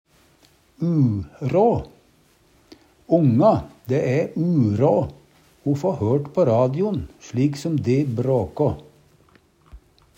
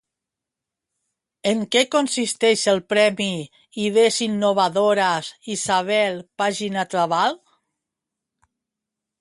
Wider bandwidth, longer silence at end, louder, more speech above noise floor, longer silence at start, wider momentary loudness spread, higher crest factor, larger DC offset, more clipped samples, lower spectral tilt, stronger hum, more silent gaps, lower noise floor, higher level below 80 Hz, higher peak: first, 15 kHz vs 11.5 kHz; second, 0.4 s vs 1.85 s; about the same, -21 LUFS vs -20 LUFS; second, 38 dB vs 65 dB; second, 0.8 s vs 1.45 s; about the same, 9 LU vs 9 LU; about the same, 18 dB vs 18 dB; neither; neither; first, -9 dB/octave vs -3 dB/octave; neither; neither; second, -58 dBFS vs -86 dBFS; first, -50 dBFS vs -66 dBFS; about the same, -4 dBFS vs -4 dBFS